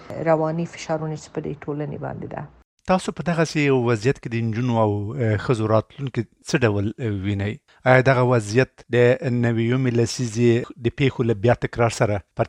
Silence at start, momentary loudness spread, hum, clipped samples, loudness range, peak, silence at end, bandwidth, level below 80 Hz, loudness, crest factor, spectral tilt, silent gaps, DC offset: 0 s; 11 LU; none; under 0.1%; 5 LU; 0 dBFS; 0 s; 11 kHz; -50 dBFS; -22 LUFS; 20 dB; -6.5 dB/octave; 2.64-2.77 s; under 0.1%